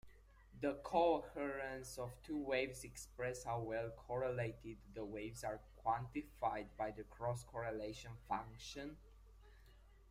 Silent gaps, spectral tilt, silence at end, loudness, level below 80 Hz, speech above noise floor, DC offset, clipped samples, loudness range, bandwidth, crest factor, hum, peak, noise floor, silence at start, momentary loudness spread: none; -5.5 dB/octave; 0 s; -44 LUFS; -62 dBFS; 21 dB; under 0.1%; under 0.1%; 4 LU; 16 kHz; 22 dB; none; -22 dBFS; -64 dBFS; 0.05 s; 12 LU